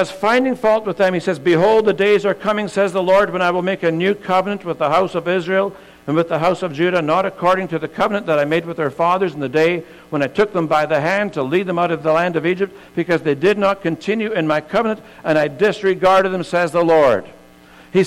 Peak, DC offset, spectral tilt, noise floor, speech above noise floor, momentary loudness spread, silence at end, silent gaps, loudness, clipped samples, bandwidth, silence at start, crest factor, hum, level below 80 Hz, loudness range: -6 dBFS; under 0.1%; -6 dB/octave; -44 dBFS; 28 dB; 6 LU; 0 s; none; -17 LUFS; under 0.1%; 14.5 kHz; 0 s; 12 dB; none; -54 dBFS; 2 LU